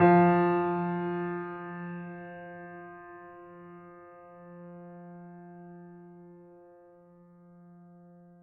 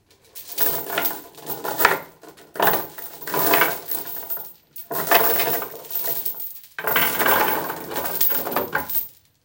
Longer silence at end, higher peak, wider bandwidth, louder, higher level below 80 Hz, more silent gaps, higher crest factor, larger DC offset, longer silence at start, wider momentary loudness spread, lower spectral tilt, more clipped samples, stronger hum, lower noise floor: first, 2.1 s vs 0.35 s; second, -10 dBFS vs 0 dBFS; second, 4.5 kHz vs 17.5 kHz; second, -29 LUFS vs -20 LUFS; second, -76 dBFS vs -62 dBFS; neither; about the same, 22 dB vs 24 dB; neither; second, 0 s vs 0.35 s; first, 25 LU vs 15 LU; first, -8 dB/octave vs -2 dB/octave; neither; neither; first, -56 dBFS vs -46 dBFS